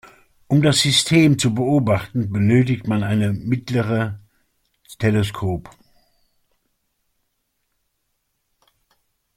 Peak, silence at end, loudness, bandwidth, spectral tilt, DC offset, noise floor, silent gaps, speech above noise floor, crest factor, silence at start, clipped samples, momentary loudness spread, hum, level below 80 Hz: -4 dBFS; 3.65 s; -19 LUFS; 16 kHz; -5 dB/octave; under 0.1%; -72 dBFS; none; 54 dB; 18 dB; 0.5 s; under 0.1%; 10 LU; none; -50 dBFS